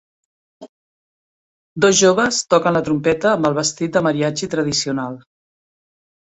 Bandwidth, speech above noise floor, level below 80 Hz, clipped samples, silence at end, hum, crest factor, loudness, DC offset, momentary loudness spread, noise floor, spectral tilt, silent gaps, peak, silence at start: 8.4 kHz; over 73 dB; -56 dBFS; under 0.1%; 1.05 s; none; 18 dB; -17 LUFS; under 0.1%; 11 LU; under -90 dBFS; -4 dB/octave; 0.69-1.76 s; -2 dBFS; 0.6 s